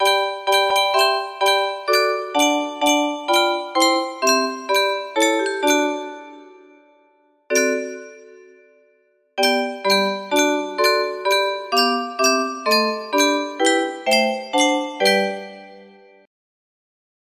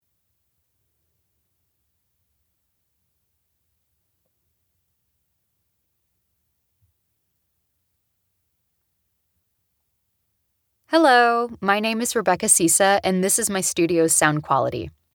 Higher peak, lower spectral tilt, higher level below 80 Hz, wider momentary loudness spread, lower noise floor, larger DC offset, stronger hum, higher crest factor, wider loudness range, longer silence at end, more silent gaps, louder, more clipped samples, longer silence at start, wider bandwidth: second, -4 dBFS vs 0 dBFS; second, -1.5 dB/octave vs -3 dB/octave; second, -70 dBFS vs -62 dBFS; second, 4 LU vs 7 LU; second, -61 dBFS vs -72 dBFS; neither; neither; second, 18 dB vs 24 dB; about the same, 6 LU vs 5 LU; first, 1.4 s vs 0.25 s; neither; about the same, -19 LUFS vs -18 LUFS; neither; second, 0 s vs 10.9 s; second, 15.5 kHz vs over 20 kHz